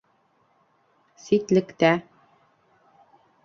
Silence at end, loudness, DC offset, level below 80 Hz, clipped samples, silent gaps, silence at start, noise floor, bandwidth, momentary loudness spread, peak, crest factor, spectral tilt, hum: 1.45 s; -22 LUFS; under 0.1%; -66 dBFS; under 0.1%; none; 1.3 s; -66 dBFS; 7.4 kHz; 7 LU; -4 dBFS; 24 dB; -6 dB/octave; none